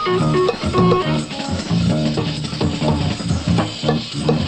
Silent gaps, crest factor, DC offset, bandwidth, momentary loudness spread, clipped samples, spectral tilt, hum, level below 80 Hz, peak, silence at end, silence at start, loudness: none; 16 dB; under 0.1%; 9.2 kHz; 6 LU; under 0.1%; -6 dB/octave; none; -36 dBFS; -2 dBFS; 0 s; 0 s; -19 LUFS